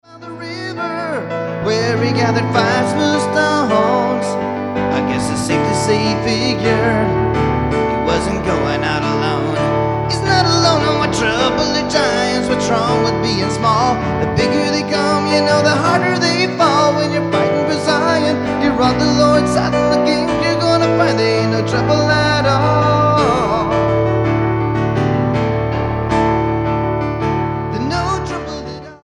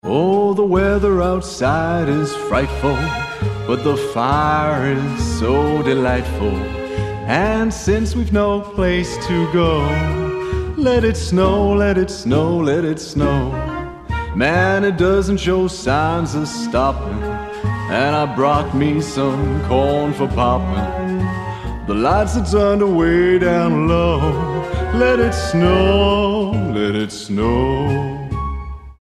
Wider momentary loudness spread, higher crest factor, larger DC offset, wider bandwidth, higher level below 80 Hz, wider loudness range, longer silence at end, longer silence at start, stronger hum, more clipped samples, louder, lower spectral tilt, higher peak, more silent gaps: about the same, 6 LU vs 8 LU; about the same, 14 dB vs 16 dB; neither; about the same, 11.5 kHz vs 12.5 kHz; second, -36 dBFS vs -28 dBFS; about the same, 3 LU vs 3 LU; about the same, 0.1 s vs 0.1 s; about the same, 0.1 s vs 0.05 s; neither; neither; about the same, -15 LUFS vs -17 LUFS; about the same, -5.5 dB/octave vs -6.5 dB/octave; about the same, 0 dBFS vs 0 dBFS; neither